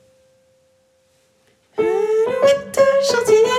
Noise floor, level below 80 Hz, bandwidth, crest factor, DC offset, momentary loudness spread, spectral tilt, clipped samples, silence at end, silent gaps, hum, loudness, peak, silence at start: -59 dBFS; -62 dBFS; 15.5 kHz; 16 dB; under 0.1%; 6 LU; -3 dB/octave; under 0.1%; 0 s; none; none; -16 LUFS; -2 dBFS; 1.75 s